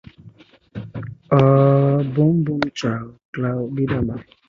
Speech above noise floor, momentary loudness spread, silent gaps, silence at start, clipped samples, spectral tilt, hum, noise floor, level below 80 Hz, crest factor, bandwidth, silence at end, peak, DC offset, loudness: 30 dB; 19 LU; 3.25-3.33 s; 0.25 s; under 0.1%; -8.5 dB/octave; none; -47 dBFS; -46 dBFS; 18 dB; 7.2 kHz; 0.25 s; -2 dBFS; under 0.1%; -19 LUFS